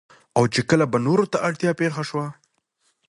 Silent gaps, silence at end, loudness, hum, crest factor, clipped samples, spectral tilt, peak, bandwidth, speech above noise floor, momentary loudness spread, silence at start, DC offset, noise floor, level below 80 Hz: none; 0.75 s; -22 LUFS; none; 18 dB; under 0.1%; -6 dB/octave; -4 dBFS; 11.5 kHz; 48 dB; 9 LU; 0.35 s; under 0.1%; -69 dBFS; -60 dBFS